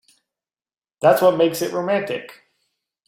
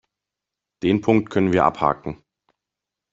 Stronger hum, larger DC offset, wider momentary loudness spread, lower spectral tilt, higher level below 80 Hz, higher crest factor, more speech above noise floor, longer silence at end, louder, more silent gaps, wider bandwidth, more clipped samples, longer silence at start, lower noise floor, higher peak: neither; neither; about the same, 11 LU vs 13 LU; second, -5 dB/octave vs -7.5 dB/octave; second, -68 dBFS vs -54 dBFS; about the same, 20 dB vs 20 dB; first, 70 dB vs 66 dB; second, 0.75 s vs 1 s; about the same, -19 LUFS vs -20 LUFS; neither; first, 16.5 kHz vs 7.8 kHz; neither; first, 1 s vs 0.8 s; about the same, -89 dBFS vs -86 dBFS; about the same, -2 dBFS vs -2 dBFS